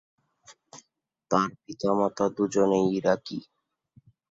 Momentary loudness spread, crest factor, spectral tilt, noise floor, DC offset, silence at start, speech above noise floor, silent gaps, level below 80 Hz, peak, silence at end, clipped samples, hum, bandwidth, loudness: 9 LU; 22 dB; -6 dB/octave; -74 dBFS; under 0.1%; 0.5 s; 48 dB; none; -66 dBFS; -8 dBFS; 0.9 s; under 0.1%; none; 7.8 kHz; -26 LUFS